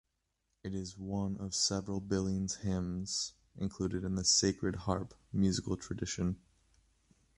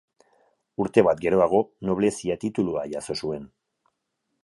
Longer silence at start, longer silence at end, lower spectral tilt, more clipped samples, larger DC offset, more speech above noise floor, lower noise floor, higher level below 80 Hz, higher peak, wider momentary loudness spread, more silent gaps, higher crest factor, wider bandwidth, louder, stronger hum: second, 0.65 s vs 0.8 s; about the same, 1 s vs 1 s; second, -4 dB/octave vs -6 dB/octave; neither; neither; second, 47 dB vs 55 dB; first, -82 dBFS vs -78 dBFS; about the same, -52 dBFS vs -56 dBFS; second, -16 dBFS vs -4 dBFS; about the same, 13 LU vs 11 LU; neither; about the same, 20 dB vs 22 dB; about the same, 11.5 kHz vs 11.5 kHz; second, -35 LUFS vs -24 LUFS; neither